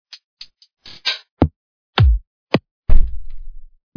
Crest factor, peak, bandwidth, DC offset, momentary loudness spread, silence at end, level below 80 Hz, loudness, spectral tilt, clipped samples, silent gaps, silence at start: 16 dB; 0 dBFS; 5.4 kHz; under 0.1%; 24 LU; 0.3 s; -20 dBFS; -21 LUFS; -6.5 dB/octave; 0.6%; 1.31-1.37 s, 1.56-1.93 s, 2.27-2.47 s, 2.71-2.83 s; 1.05 s